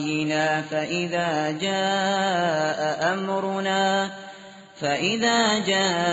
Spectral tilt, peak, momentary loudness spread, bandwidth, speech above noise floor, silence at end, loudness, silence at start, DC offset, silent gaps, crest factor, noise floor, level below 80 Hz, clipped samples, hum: -2.5 dB/octave; -6 dBFS; 6 LU; 8 kHz; 21 dB; 0 s; -23 LUFS; 0 s; under 0.1%; none; 16 dB; -44 dBFS; -64 dBFS; under 0.1%; none